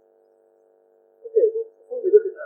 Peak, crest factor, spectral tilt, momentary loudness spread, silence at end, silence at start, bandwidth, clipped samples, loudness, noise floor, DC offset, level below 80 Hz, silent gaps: -4 dBFS; 20 dB; -9 dB/octave; 13 LU; 0 s; 1.25 s; 1.9 kHz; under 0.1%; -22 LUFS; -59 dBFS; under 0.1%; under -90 dBFS; none